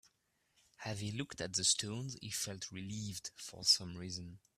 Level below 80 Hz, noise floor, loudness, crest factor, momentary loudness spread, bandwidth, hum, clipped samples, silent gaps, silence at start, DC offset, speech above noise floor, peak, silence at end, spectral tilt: -70 dBFS; -79 dBFS; -37 LUFS; 24 dB; 15 LU; 15.5 kHz; none; under 0.1%; none; 0.8 s; under 0.1%; 40 dB; -16 dBFS; 0.2 s; -2 dB/octave